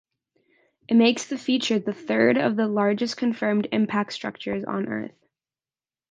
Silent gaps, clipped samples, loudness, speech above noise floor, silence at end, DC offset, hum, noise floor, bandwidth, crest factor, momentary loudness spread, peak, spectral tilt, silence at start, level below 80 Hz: none; under 0.1%; -24 LUFS; over 67 dB; 1 s; under 0.1%; none; under -90 dBFS; 9.4 kHz; 20 dB; 11 LU; -6 dBFS; -5 dB/octave; 0.9 s; -68 dBFS